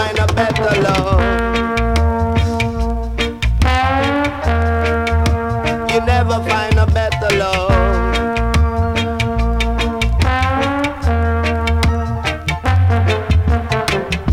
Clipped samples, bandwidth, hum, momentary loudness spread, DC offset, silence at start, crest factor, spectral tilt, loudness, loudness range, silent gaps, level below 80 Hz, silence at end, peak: under 0.1%; 13.5 kHz; none; 4 LU; under 0.1%; 0 s; 14 dB; -6 dB/octave; -16 LUFS; 1 LU; none; -20 dBFS; 0 s; 0 dBFS